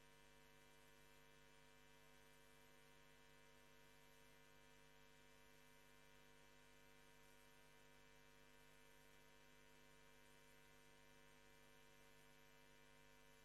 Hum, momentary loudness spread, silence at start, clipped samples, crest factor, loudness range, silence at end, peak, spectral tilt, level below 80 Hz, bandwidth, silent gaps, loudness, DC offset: none; 0 LU; 0 s; under 0.1%; 16 dB; 0 LU; 0 s; -56 dBFS; -3 dB/octave; -82 dBFS; 12.5 kHz; none; -70 LUFS; under 0.1%